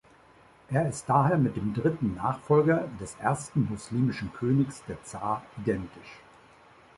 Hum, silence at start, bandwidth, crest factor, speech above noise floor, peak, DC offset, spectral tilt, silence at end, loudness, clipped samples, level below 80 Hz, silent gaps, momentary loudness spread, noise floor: none; 0.7 s; 11.5 kHz; 18 dB; 29 dB; -10 dBFS; under 0.1%; -7.5 dB/octave; 0.8 s; -28 LUFS; under 0.1%; -56 dBFS; none; 13 LU; -57 dBFS